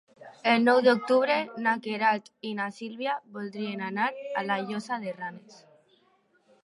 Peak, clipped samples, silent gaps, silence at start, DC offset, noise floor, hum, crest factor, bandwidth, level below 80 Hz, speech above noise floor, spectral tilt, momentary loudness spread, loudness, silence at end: -8 dBFS; under 0.1%; none; 0.2 s; under 0.1%; -67 dBFS; none; 20 dB; 11.5 kHz; -84 dBFS; 39 dB; -5.5 dB/octave; 13 LU; -27 LUFS; 1.1 s